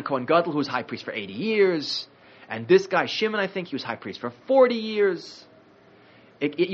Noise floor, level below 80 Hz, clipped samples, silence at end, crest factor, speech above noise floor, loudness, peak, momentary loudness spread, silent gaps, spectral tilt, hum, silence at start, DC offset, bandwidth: -54 dBFS; -74 dBFS; under 0.1%; 0 s; 20 dB; 30 dB; -24 LUFS; -4 dBFS; 15 LU; none; -3 dB/octave; none; 0 s; under 0.1%; 7.4 kHz